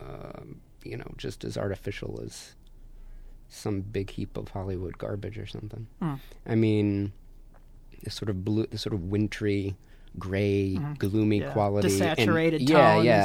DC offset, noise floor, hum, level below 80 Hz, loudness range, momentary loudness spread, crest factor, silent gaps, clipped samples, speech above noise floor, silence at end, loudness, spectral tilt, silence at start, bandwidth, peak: under 0.1%; -49 dBFS; none; -48 dBFS; 10 LU; 18 LU; 22 dB; none; under 0.1%; 22 dB; 0 s; -27 LUFS; -6.5 dB/octave; 0 s; 16.5 kHz; -6 dBFS